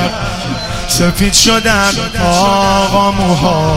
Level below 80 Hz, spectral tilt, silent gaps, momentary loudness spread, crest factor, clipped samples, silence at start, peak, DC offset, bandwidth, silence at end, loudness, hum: -26 dBFS; -3.5 dB/octave; none; 10 LU; 12 dB; under 0.1%; 0 s; 0 dBFS; under 0.1%; 16.5 kHz; 0 s; -11 LUFS; none